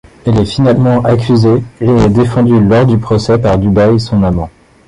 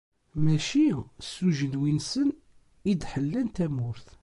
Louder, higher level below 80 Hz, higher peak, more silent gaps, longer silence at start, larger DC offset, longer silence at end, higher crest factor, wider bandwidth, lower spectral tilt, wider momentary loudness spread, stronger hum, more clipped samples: first, -10 LUFS vs -28 LUFS; first, -30 dBFS vs -52 dBFS; first, 0 dBFS vs -12 dBFS; neither; about the same, 0.25 s vs 0.35 s; neither; first, 0.4 s vs 0.15 s; about the same, 10 dB vs 14 dB; about the same, 11 kHz vs 11.5 kHz; first, -8 dB/octave vs -6 dB/octave; second, 4 LU vs 10 LU; neither; neither